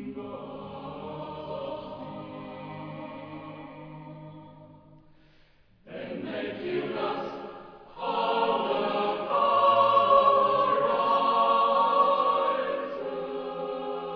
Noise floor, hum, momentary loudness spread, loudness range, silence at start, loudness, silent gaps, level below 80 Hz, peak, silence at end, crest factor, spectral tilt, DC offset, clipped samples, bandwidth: -59 dBFS; none; 21 LU; 20 LU; 0 s; -25 LUFS; none; -64 dBFS; -10 dBFS; 0 s; 18 dB; -7.5 dB/octave; under 0.1%; under 0.1%; 5.4 kHz